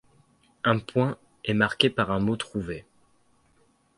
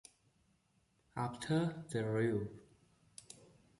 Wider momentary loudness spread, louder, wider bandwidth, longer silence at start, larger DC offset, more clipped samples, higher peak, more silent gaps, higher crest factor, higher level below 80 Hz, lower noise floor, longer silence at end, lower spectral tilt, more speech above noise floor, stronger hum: second, 12 LU vs 22 LU; first, -26 LUFS vs -38 LUFS; about the same, 11.5 kHz vs 11.5 kHz; second, 0.65 s vs 1.15 s; neither; neither; first, -2 dBFS vs -24 dBFS; neither; first, 26 dB vs 18 dB; first, -54 dBFS vs -70 dBFS; second, -65 dBFS vs -76 dBFS; first, 1.15 s vs 0.45 s; about the same, -6 dB/octave vs -6.5 dB/octave; about the same, 40 dB vs 39 dB; neither